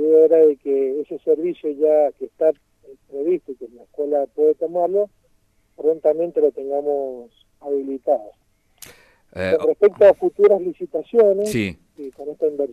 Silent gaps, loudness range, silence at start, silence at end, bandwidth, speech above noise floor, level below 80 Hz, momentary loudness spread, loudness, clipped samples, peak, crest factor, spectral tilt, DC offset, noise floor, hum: none; 6 LU; 0 s; 0 s; 13.5 kHz; 42 dB; -60 dBFS; 19 LU; -19 LUFS; under 0.1%; -2 dBFS; 18 dB; -6.5 dB/octave; under 0.1%; -61 dBFS; none